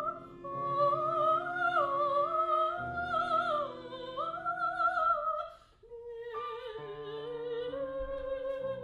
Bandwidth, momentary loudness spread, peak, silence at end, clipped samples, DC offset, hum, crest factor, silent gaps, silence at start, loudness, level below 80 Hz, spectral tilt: 10 kHz; 13 LU; -18 dBFS; 0 s; under 0.1%; under 0.1%; none; 14 dB; none; 0 s; -33 LUFS; -60 dBFS; -6 dB/octave